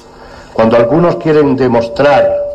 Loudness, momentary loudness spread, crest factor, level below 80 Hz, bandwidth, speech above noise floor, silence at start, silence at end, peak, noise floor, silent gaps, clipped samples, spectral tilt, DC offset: -10 LUFS; 3 LU; 10 dB; -38 dBFS; 8.4 kHz; 25 dB; 0.2 s; 0 s; -2 dBFS; -33 dBFS; none; under 0.1%; -7.5 dB/octave; under 0.1%